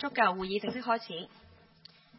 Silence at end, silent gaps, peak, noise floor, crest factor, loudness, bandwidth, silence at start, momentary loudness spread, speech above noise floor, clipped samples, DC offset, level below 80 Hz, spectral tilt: 0.9 s; none; -10 dBFS; -59 dBFS; 22 dB; -32 LUFS; 5.8 kHz; 0 s; 14 LU; 27 dB; under 0.1%; under 0.1%; -66 dBFS; -8.5 dB/octave